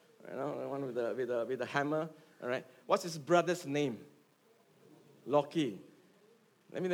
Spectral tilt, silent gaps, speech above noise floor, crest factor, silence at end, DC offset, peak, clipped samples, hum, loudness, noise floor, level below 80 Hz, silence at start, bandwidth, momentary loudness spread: -5.5 dB/octave; none; 33 dB; 22 dB; 0 s; under 0.1%; -14 dBFS; under 0.1%; none; -35 LUFS; -68 dBFS; under -90 dBFS; 0.25 s; 17.5 kHz; 14 LU